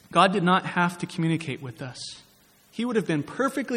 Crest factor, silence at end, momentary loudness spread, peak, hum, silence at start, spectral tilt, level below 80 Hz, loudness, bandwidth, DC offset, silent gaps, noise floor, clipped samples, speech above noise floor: 22 dB; 0 s; 17 LU; -4 dBFS; none; 0.1 s; -5.5 dB/octave; -66 dBFS; -25 LUFS; 14.5 kHz; under 0.1%; none; -58 dBFS; under 0.1%; 33 dB